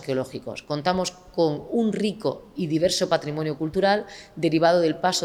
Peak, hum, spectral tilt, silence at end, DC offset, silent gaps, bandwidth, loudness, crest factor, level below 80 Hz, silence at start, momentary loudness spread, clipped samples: -6 dBFS; none; -5 dB/octave; 0 s; under 0.1%; none; 16 kHz; -24 LUFS; 18 dB; -56 dBFS; 0 s; 10 LU; under 0.1%